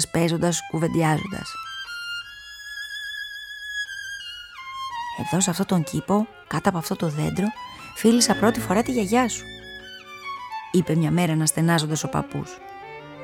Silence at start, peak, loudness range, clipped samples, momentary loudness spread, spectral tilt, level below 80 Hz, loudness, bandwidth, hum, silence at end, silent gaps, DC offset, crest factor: 0 s; -4 dBFS; 9 LU; under 0.1%; 16 LU; -4.5 dB/octave; -54 dBFS; -24 LUFS; 17 kHz; none; 0 s; none; under 0.1%; 20 dB